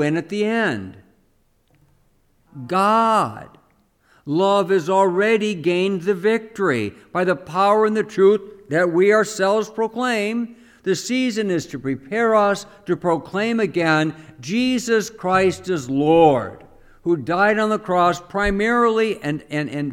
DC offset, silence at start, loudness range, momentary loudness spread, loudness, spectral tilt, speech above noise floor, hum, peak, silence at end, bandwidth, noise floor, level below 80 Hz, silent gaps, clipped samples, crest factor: under 0.1%; 0 s; 3 LU; 10 LU; -19 LUFS; -5.5 dB/octave; 42 dB; none; -2 dBFS; 0 s; 15.5 kHz; -61 dBFS; -48 dBFS; none; under 0.1%; 18 dB